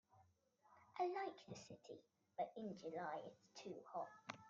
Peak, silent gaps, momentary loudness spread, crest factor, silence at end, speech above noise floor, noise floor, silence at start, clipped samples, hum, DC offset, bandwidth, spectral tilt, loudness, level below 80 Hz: -32 dBFS; none; 14 LU; 20 dB; 0 s; 27 dB; -78 dBFS; 0.15 s; under 0.1%; none; under 0.1%; 7.4 kHz; -4 dB/octave; -51 LUFS; under -90 dBFS